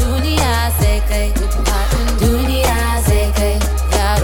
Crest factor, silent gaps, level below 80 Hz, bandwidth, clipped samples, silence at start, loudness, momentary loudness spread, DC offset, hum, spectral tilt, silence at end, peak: 12 dB; none; -16 dBFS; 17.5 kHz; under 0.1%; 0 s; -16 LUFS; 3 LU; under 0.1%; none; -5 dB/octave; 0 s; -2 dBFS